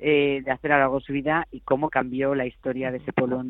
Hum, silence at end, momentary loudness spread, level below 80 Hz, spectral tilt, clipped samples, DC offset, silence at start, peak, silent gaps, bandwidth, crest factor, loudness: none; 0 s; 7 LU; -52 dBFS; -9.5 dB/octave; under 0.1%; under 0.1%; 0 s; -4 dBFS; none; 4.1 kHz; 20 dB; -24 LUFS